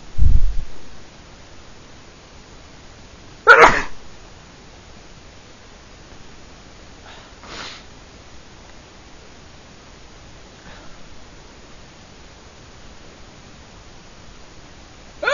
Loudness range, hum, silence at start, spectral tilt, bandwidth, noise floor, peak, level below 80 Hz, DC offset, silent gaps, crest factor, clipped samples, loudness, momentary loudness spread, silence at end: 25 LU; none; 0.15 s; -4 dB/octave; 7.4 kHz; -43 dBFS; 0 dBFS; -30 dBFS; under 0.1%; none; 22 dB; under 0.1%; -15 LUFS; 23 LU; 0 s